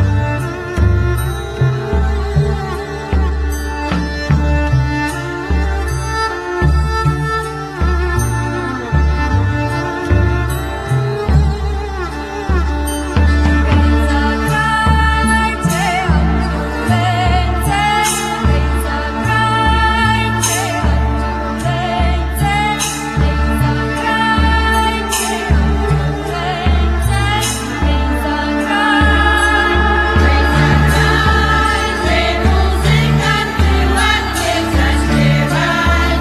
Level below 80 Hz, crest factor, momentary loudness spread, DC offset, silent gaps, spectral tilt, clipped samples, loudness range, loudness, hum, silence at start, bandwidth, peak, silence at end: -18 dBFS; 14 dB; 7 LU; under 0.1%; none; -5 dB/octave; under 0.1%; 5 LU; -15 LUFS; none; 0 s; 14 kHz; 0 dBFS; 0 s